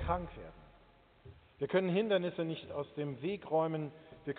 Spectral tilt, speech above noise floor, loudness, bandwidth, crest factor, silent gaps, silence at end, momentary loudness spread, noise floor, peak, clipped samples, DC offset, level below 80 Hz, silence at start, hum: -5.5 dB/octave; 28 dB; -36 LUFS; 4.6 kHz; 18 dB; none; 0 s; 16 LU; -64 dBFS; -18 dBFS; under 0.1%; under 0.1%; -56 dBFS; 0 s; none